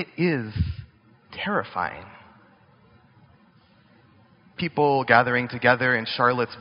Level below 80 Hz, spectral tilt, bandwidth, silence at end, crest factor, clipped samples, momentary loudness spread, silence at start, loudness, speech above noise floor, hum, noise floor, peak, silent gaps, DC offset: -46 dBFS; -3.5 dB/octave; 5.6 kHz; 0 s; 24 dB; under 0.1%; 15 LU; 0 s; -23 LUFS; 34 dB; none; -57 dBFS; 0 dBFS; none; under 0.1%